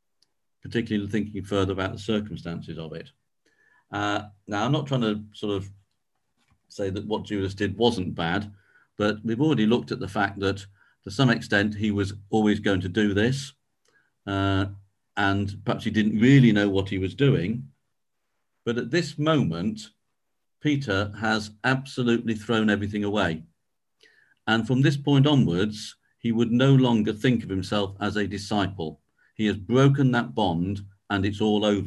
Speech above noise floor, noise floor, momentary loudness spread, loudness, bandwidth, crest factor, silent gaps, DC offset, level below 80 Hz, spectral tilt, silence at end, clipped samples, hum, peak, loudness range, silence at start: 59 dB; -83 dBFS; 14 LU; -25 LUFS; 11.5 kHz; 20 dB; none; under 0.1%; -50 dBFS; -6.5 dB/octave; 0 s; under 0.1%; none; -4 dBFS; 7 LU; 0.65 s